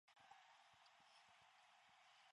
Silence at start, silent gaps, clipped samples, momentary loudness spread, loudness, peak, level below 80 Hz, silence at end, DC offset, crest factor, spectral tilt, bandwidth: 0.05 s; none; under 0.1%; 2 LU; -69 LUFS; -52 dBFS; under -90 dBFS; 0 s; under 0.1%; 20 dB; -0.5 dB/octave; 11 kHz